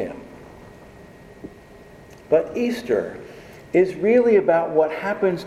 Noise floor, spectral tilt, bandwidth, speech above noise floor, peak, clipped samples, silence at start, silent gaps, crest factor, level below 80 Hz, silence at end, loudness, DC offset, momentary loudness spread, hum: -45 dBFS; -7 dB/octave; 13.5 kHz; 26 dB; -4 dBFS; under 0.1%; 0 s; none; 18 dB; -56 dBFS; 0 s; -20 LUFS; under 0.1%; 25 LU; none